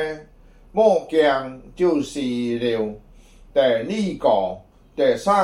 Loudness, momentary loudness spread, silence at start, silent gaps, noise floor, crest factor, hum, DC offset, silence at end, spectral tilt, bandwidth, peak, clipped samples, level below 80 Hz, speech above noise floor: -21 LUFS; 12 LU; 0 s; none; -48 dBFS; 16 dB; none; under 0.1%; 0 s; -5.5 dB/octave; 12.5 kHz; -4 dBFS; under 0.1%; -50 dBFS; 29 dB